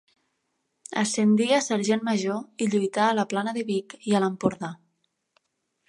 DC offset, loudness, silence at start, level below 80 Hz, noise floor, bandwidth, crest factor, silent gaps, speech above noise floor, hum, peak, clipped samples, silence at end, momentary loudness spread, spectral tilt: under 0.1%; -25 LUFS; 0.9 s; -70 dBFS; -76 dBFS; 11.5 kHz; 18 dB; none; 52 dB; none; -8 dBFS; under 0.1%; 1.15 s; 8 LU; -4.5 dB/octave